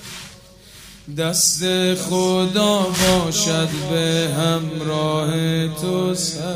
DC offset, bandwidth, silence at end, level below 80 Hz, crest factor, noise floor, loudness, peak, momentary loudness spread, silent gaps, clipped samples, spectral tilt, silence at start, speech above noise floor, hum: under 0.1%; 16 kHz; 0 s; -46 dBFS; 16 dB; -44 dBFS; -19 LUFS; -4 dBFS; 8 LU; none; under 0.1%; -4 dB/octave; 0 s; 24 dB; none